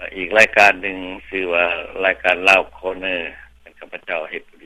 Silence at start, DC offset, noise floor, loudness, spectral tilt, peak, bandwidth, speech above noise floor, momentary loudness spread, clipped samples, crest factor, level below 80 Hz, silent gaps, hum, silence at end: 0 s; under 0.1%; -43 dBFS; -17 LUFS; -2.5 dB/octave; 0 dBFS; 15 kHz; 24 dB; 18 LU; under 0.1%; 20 dB; -50 dBFS; none; none; 0.25 s